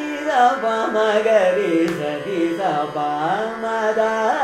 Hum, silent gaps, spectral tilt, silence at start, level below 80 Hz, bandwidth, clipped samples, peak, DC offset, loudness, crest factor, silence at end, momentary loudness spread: none; none; -5 dB/octave; 0 s; -62 dBFS; 15 kHz; under 0.1%; -4 dBFS; under 0.1%; -19 LUFS; 14 dB; 0 s; 7 LU